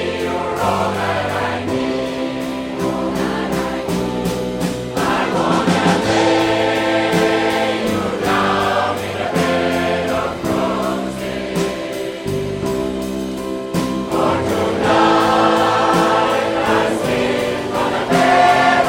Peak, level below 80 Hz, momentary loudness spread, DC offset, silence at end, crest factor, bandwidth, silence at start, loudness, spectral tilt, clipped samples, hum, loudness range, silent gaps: -2 dBFS; -42 dBFS; 9 LU; under 0.1%; 0 s; 16 dB; 16.5 kHz; 0 s; -17 LUFS; -5 dB/octave; under 0.1%; none; 6 LU; none